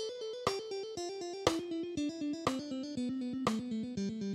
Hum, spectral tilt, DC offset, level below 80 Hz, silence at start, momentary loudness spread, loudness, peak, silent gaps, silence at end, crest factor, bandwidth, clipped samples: none; -5 dB/octave; under 0.1%; -64 dBFS; 0 s; 6 LU; -37 LUFS; -12 dBFS; none; 0 s; 26 dB; 15.5 kHz; under 0.1%